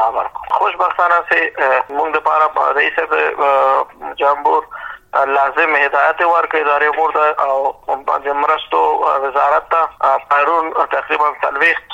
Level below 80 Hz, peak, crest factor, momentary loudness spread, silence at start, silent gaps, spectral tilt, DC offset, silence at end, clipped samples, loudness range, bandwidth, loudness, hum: -56 dBFS; -2 dBFS; 12 dB; 5 LU; 0 s; none; -3.5 dB/octave; under 0.1%; 0 s; under 0.1%; 1 LU; 16 kHz; -15 LUFS; none